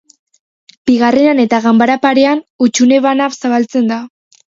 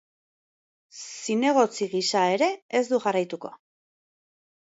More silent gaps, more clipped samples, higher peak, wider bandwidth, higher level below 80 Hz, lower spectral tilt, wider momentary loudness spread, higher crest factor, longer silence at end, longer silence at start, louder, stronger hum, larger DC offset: about the same, 2.50-2.59 s vs 2.62-2.69 s; neither; first, 0 dBFS vs -8 dBFS; about the same, 7.6 kHz vs 8 kHz; first, -58 dBFS vs -80 dBFS; about the same, -4 dB/octave vs -3.5 dB/octave; second, 5 LU vs 16 LU; second, 12 dB vs 18 dB; second, 0.5 s vs 1.1 s; about the same, 0.85 s vs 0.95 s; first, -12 LUFS vs -24 LUFS; neither; neither